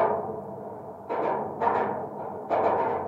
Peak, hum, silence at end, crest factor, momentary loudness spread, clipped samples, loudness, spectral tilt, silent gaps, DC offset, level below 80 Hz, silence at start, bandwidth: -10 dBFS; none; 0 s; 18 dB; 13 LU; under 0.1%; -29 LUFS; -8 dB/octave; none; under 0.1%; -68 dBFS; 0 s; 7.6 kHz